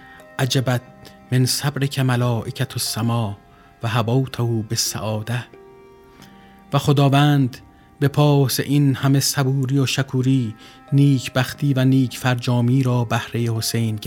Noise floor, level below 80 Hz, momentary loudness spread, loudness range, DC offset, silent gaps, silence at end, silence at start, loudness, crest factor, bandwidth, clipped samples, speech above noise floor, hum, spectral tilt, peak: -46 dBFS; -54 dBFS; 9 LU; 5 LU; under 0.1%; none; 0 s; 0.1 s; -20 LUFS; 18 dB; 17.5 kHz; under 0.1%; 27 dB; none; -5.5 dB/octave; -2 dBFS